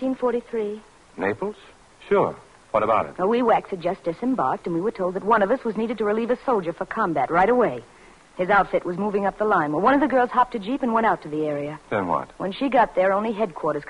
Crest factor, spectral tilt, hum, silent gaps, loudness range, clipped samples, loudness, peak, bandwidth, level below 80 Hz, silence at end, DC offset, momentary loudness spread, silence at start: 16 dB; -7 dB/octave; none; none; 3 LU; under 0.1%; -23 LUFS; -6 dBFS; 11 kHz; -54 dBFS; 0 s; under 0.1%; 9 LU; 0 s